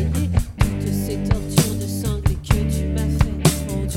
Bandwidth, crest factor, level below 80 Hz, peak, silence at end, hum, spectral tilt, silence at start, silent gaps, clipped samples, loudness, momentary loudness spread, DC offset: 17 kHz; 20 dB; -26 dBFS; 0 dBFS; 0 s; none; -5.5 dB/octave; 0 s; none; under 0.1%; -21 LUFS; 5 LU; under 0.1%